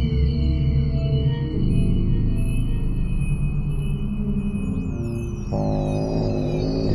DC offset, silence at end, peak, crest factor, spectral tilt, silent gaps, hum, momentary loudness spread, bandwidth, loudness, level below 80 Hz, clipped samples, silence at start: under 0.1%; 0 s; -8 dBFS; 12 dB; -8.5 dB/octave; none; 50 Hz at -45 dBFS; 5 LU; 11.5 kHz; -24 LUFS; -26 dBFS; under 0.1%; 0 s